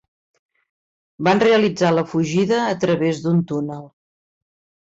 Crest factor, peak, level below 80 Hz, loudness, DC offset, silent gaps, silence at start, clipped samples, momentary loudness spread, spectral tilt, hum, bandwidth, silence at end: 14 dB; -6 dBFS; -60 dBFS; -18 LUFS; under 0.1%; none; 1.2 s; under 0.1%; 10 LU; -6 dB/octave; none; 7.8 kHz; 1 s